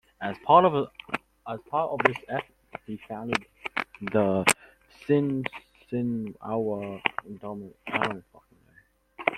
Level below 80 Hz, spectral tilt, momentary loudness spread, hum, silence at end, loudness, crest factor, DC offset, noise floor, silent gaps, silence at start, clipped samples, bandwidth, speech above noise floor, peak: -64 dBFS; -4.5 dB/octave; 17 LU; none; 0 s; -27 LUFS; 28 dB; under 0.1%; -61 dBFS; none; 0.2 s; under 0.1%; 16.5 kHz; 35 dB; -2 dBFS